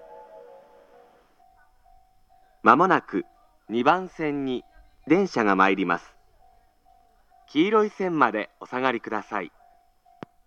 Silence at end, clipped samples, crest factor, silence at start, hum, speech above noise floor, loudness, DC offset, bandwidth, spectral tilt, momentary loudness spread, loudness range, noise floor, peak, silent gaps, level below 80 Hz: 1 s; under 0.1%; 26 dB; 0.1 s; none; 37 dB; -24 LUFS; under 0.1%; 7.8 kHz; -6 dB/octave; 13 LU; 3 LU; -59 dBFS; 0 dBFS; none; -64 dBFS